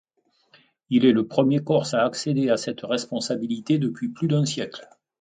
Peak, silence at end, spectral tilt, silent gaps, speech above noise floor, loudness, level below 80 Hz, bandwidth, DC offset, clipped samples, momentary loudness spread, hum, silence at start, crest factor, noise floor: -6 dBFS; 0.35 s; -6 dB/octave; none; 42 dB; -23 LUFS; -68 dBFS; 9.4 kHz; under 0.1%; under 0.1%; 8 LU; none; 0.9 s; 18 dB; -65 dBFS